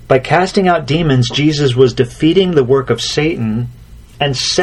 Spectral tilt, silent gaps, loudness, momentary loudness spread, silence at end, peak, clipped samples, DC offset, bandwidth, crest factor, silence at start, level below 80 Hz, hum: -5.5 dB/octave; none; -13 LUFS; 7 LU; 0 s; 0 dBFS; under 0.1%; under 0.1%; 12 kHz; 12 dB; 0 s; -38 dBFS; none